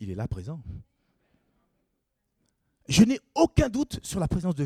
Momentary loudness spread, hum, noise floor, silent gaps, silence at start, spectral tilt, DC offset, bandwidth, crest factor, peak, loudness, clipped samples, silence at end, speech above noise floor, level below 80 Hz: 19 LU; none; -78 dBFS; none; 0 s; -5.5 dB/octave; under 0.1%; 15 kHz; 22 dB; -6 dBFS; -25 LUFS; under 0.1%; 0 s; 53 dB; -42 dBFS